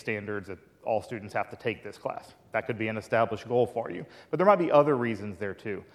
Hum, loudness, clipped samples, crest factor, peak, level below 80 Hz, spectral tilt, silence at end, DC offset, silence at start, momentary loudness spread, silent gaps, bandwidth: none; -29 LUFS; under 0.1%; 22 dB; -8 dBFS; -68 dBFS; -7 dB/octave; 0.1 s; under 0.1%; 0.05 s; 15 LU; none; 12.5 kHz